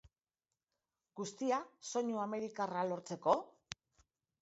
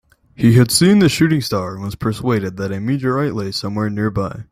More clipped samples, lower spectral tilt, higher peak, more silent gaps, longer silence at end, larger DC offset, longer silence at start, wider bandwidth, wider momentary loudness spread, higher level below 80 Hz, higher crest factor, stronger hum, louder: neither; about the same, -4.5 dB/octave vs -5.5 dB/octave; second, -18 dBFS vs 0 dBFS; neither; first, 0.9 s vs 0.1 s; neither; first, 1.15 s vs 0.4 s; second, 8 kHz vs 16 kHz; first, 17 LU vs 11 LU; second, -78 dBFS vs -46 dBFS; first, 22 dB vs 16 dB; neither; second, -38 LUFS vs -17 LUFS